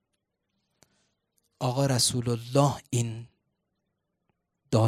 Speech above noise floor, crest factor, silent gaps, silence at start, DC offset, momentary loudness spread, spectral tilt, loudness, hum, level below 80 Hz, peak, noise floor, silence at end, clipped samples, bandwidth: 54 dB; 24 dB; none; 1.6 s; under 0.1%; 10 LU; -5 dB/octave; -27 LUFS; none; -62 dBFS; -6 dBFS; -80 dBFS; 0 s; under 0.1%; 15 kHz